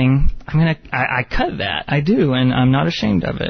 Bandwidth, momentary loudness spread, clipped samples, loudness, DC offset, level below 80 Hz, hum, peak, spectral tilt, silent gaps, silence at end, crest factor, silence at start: 6.4 kHz; 5 LU; under 0.1%; -17 LUFS; under 0.1%; -28 dBFS; none; -4 dBFS; -7.5 dB/octave; none; 0 s; 12 dB; 0 s